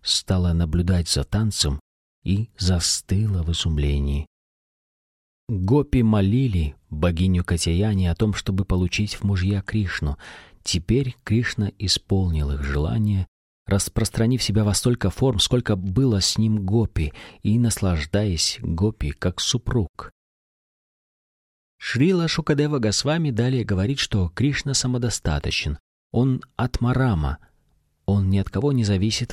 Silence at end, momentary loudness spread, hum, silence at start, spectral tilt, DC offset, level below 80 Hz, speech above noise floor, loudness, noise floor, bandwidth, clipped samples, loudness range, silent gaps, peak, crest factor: 0 s; 7 LU; none; 0.05 s; -5 dB/octave; under 0.1%; -34 dBFS; 43 dB; -22 LUFS; -65 dBFS; 14.5 kHz; under 0.1%; 3 LU; 1.81-2.22 s, 4.27-5.47 s, 13.28-13.65 s, 19.89-19.94 s, 20.12-21.79 s, 25.80-26.10 s; -4 dBFS; 18 dB